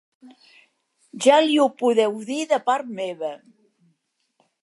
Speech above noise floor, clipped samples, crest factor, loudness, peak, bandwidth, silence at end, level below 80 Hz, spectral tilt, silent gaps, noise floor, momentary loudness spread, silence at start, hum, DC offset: 50 dB; under 0.1%; 20 dB; -21 LUFS; -2 dBFS; 11.5 kHz; 1.25 s; -82 dBFS; -3.5 dB/octave; none; -71 dBFS; 14 LU; 0.25 s; none; under 0.1%